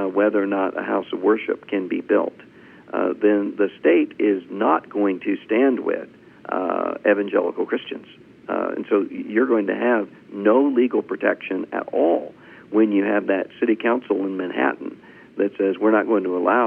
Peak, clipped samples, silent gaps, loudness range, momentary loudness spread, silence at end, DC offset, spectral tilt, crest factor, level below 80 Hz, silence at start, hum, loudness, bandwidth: -4 dBFS; under 0.1%; none; 2 LU; 9 LU; 0 s; under 0.1%; -8.5 dB/octave; 16 dB; -72 dBFS; 0 s; none; -21 LUFS; 3.8 kHz